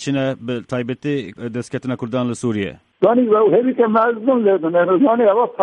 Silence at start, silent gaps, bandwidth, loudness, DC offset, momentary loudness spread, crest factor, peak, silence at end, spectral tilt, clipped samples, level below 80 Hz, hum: 0 s; none; 10.5 kHz; -17 LUFS; under 0.1%; 11 LU; 16 dB; -2 dBFS; 0 s; -7 dB/octave; under 0.1%; -60 dBFS; none